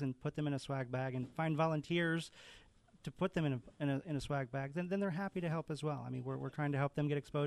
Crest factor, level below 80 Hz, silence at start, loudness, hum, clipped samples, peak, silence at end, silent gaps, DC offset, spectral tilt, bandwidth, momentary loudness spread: 16 dB; -66 dBFS; 0 s; -39 LUFS; none; under 0.1%; -24 dBFS; 0 s; none; under 0.1%; -7 dB/octave; 12 kHz; 7 LU